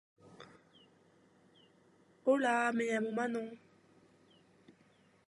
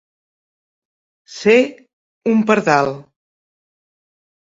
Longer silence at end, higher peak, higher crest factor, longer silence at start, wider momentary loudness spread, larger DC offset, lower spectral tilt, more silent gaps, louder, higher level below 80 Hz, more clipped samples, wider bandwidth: first, 1.7 s vs 1.4 s; second, -18 dBFS vs 0 dBFS; about the same, 20 dB vs 20 dB; second, 0.4 s vs 1.3 s; first, 27 LU vs 14 LU; neither; about the same, -4.5 dB/octave vs -5.5 dB/octave; second, none vs 1.93-2.21 s; second, -34 LUFS vs -16 LUFS; second, -88 dBFS vs -62 dBFS; neither; first, 11.5 kHz vs 7.8 kHz